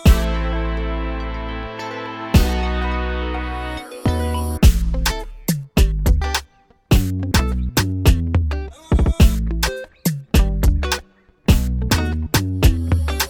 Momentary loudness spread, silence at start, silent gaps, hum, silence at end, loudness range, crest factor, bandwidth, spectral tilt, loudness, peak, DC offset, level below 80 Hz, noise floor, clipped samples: 10 LU; 0 s; none; none; 0 s; 3 LU; 18 dB; over 20 kHz; -5.5 dB/octave; -20 LUFS; 0 dBFS; under 0.1%; -20 dBFS; -48 dBFS; under 0.1%